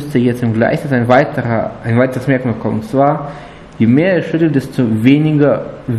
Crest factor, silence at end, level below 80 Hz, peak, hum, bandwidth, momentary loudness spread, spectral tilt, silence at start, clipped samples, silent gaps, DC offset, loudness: 14 dB; 0 s; -44 dBFS; 0 dBFS; none; 13 kHz; 7 LU; -8.5 dB/octave; 0 s; under 0.1%; none; under 0.1%; -14 LUFS